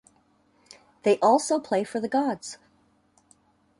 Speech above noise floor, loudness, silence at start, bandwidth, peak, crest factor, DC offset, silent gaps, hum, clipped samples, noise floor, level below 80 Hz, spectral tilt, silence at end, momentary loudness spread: 41 dB; -25 LUFS; 1.05 s; 11.5 kHz; -8 dBFS; 20 dB; under 0.1%; none; none; under 0.1%; -64 dBFS; -72 dBFS; -4.5 dB/octave; 1.25 s; 16 LU